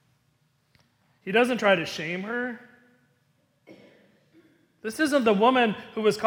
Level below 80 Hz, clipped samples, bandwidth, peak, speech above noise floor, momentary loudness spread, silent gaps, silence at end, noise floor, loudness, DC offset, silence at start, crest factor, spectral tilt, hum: -72 dBFS; under 0.1%; 17.5 kHz; -8 dBFS; 45 dB; 16 LU; none; 0 s; -69 dBFS; -24 LUFS; under 0.1%; 1.25 s; 20 dB; -5 dB/octave; none